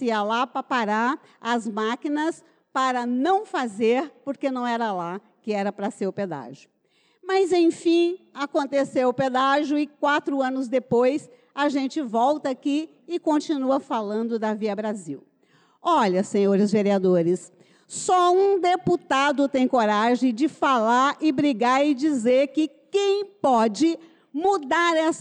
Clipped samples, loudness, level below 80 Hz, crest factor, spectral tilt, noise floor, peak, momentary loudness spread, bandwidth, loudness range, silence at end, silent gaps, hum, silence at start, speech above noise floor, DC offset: under 0.1%; -23 LUFS; -70 dBFS; 10 dB; -5 dB/octave; -65 dBFS; -12 dBFS; 10 LU; 10.5 kHz; 5 LU; 0 s; none; none; 0 s; 43 dB; under 0.1%